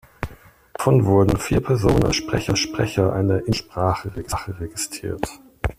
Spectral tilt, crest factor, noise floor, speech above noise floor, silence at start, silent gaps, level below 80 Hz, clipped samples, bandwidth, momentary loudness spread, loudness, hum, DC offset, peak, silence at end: -5.5 dB/octave; 18 dB; -43 dBFS; 23 dB; 0.2 s; none; -36 dBFS; under 0.1%; 15.5 kHz; 13 LU; -21 LUFS; none; under 0.1%; -2 dBFS; 0.05 s